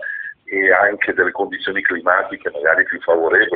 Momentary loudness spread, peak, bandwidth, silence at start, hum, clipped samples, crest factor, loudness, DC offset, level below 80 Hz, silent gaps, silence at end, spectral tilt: 10 LU; 0 dBFS; 4.8 kHz; 0 s; none; under 0.1%; 18 dB; -16 LUFS; under 0.1%; -58 dBFS; none; 0 s; -0.5 dB/octave